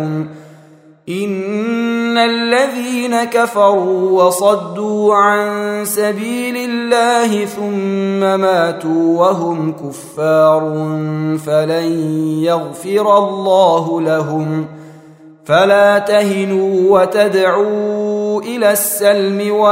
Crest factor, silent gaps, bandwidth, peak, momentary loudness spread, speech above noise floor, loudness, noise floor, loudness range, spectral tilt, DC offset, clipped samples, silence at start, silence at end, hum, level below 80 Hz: 14 dB; none; 16 kHz; 0 dBFS; 8 LU; 30 dB; -14 LUFS; -43 dBFS; 3 LU; -5 dB/octave; under 0.1%; under 0.1%; 0 s; 0 s; none; -64 dBFS